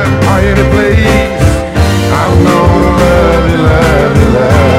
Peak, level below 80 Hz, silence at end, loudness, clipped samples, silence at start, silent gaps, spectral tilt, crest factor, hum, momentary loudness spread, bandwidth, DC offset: 0 dBFS; -16 dBFS; 0 s; -8 LUFS; 1%; 0 s; none; -6.5 dB/octave; 6 dB; none; 3 LU; 16 kHz; under 0.1%